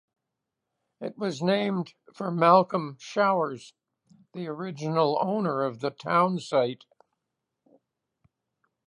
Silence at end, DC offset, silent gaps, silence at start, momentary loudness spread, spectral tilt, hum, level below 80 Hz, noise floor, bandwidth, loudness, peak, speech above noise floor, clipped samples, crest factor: 2.15 s; under 0.1%; none; 1 s; 18 LU; -6.5 dB/octave; none; -78 dBFS; -85 dBFS; 11 kHz; -26 LUFS; -6 dBFS; 59 dB; under 0.1%; 22 dB